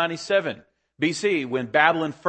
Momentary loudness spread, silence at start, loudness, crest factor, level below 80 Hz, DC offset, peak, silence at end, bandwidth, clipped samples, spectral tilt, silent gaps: 9 LU; 0 s; -23 LUFS; 22 dB; -68 dBFS; under 0.1%; -2 dBFS; 0 s; 8.8 kHz; under 0.1%; -4.5 dB/octave; none